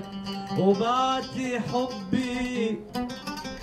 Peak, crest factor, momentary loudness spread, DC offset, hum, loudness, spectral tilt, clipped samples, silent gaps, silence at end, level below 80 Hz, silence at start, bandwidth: -10 dBFS; 16 dB; 11 LU; under 0.1%; none; -28 LUFS; -5.5 dB/octave; under 0.1%; none; 0 s; -54 dBFS; 0 s; 14.5 kHz